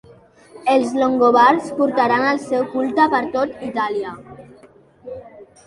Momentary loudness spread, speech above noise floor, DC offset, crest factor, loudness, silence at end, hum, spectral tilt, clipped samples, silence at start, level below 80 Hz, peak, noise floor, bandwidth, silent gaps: 21 LU; 31 dB; under 0.1%; 18 dB; -17 LUFS; 0.25 s; none; -5 dB/octave; under 0.1%; 0.55 s; -60 dBFS; -2 dBFS; -48 dBFS; 11.5 kHz; none